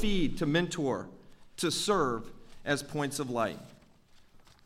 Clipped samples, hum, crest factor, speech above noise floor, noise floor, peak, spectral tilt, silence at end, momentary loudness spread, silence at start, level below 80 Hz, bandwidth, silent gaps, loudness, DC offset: under 0.1%; none; 18 dB; 28 dB; -59 dBFS; -14 dBFS; -4.5 dB/octave; 0.25 s; 17 LU; 0 s; -46 dBFS; 15.5 kHz; none; -32 LUFS; under 0.1%